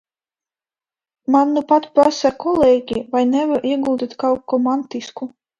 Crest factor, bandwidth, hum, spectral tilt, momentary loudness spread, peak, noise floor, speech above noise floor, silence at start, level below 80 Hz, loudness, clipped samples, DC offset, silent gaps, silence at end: 18 dB; 9 kHz; none; -5 dB/octave; 12 LU; 0 dBFS; under -90 dBFS; over 73 dB; 1.3 s; -54 dBFS; -17 LUFS; under 0.1%; under 0.1%; none; 0.3 s